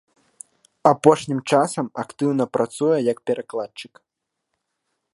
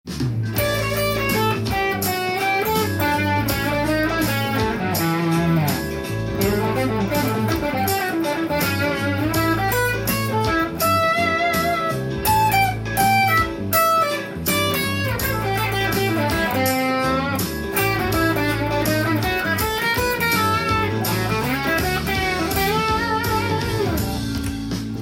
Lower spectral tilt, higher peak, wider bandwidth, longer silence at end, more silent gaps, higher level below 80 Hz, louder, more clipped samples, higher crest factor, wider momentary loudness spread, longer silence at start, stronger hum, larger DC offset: first, -6 dB/octave vs -4.5 dB/octave; first, 0 dBFS vs -6 dBFS; second, 11.5 kHz vs 17 kHz; first, 1.3 s vs 0 s; neither; second, -68 dBFS vs -38 dBFS; about the same, -21 LUFS vs -20 LUFS; neither; first, 22 dB vs 16 dB; first, 13 LU vs 4 LU; first, 0.85 s vs 0.05 s; neither; neither